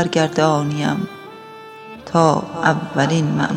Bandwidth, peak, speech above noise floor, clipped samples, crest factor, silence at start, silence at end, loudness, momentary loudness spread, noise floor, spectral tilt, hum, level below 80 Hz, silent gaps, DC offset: 10.5 kHz; 0 dBFS; 20 dB; under 0.1%; 18 dB; 0 s; 0 s; -18 LUFS; 21 LU; -37 dBFS; -6 dB/octave; none; -56 dBFS; none; under 0.1%